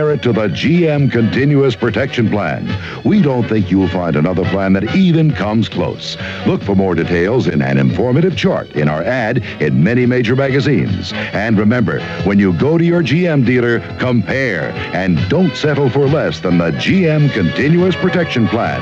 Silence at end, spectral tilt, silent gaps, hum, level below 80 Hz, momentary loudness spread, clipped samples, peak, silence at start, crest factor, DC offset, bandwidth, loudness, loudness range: 0 s; -7.5 dB/octave; none; none; -42 dBFS; 5 LU; under 0.1%; -2 dBFS; 0 s; 12 dB; 0.1%; 7.8 kHz; -14 LUFS; 1 LU